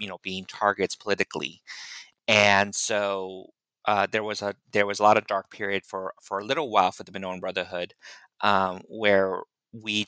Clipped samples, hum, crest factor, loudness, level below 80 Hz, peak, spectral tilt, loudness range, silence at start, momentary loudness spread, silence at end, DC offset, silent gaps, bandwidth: under 0.1%; none; 22 dB; -25 LUFS; -74 dBFS; -4 dBFS; -3 dB/octave; 3 LU; 0 s; 15 LU; 0.05 s; under 0.1%; none; 9.6 kHz